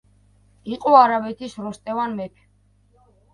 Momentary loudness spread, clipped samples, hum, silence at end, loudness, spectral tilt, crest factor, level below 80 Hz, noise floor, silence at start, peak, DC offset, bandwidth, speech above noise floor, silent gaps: 19 LU; under 0.1%; 50 Hz at -50 dBFS; 1.05 s; -20 LUFS; -6 dB/octave; 22 dB; -60 dBFS; -59 dBFS; 0.65 s; 0 dBFS; under 0.1%; 11 kHz; 39 dB; none